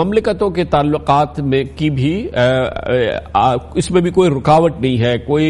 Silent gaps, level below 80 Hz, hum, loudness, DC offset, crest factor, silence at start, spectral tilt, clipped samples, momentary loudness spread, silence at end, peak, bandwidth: none; -36 dBFS; none; -15 LUFS; under 0.1%; 14 dB; 0 s; -6.5 dB/octave; under 0.1%; 5 LU; 0 s; 0 dBFS; 11.5 kHz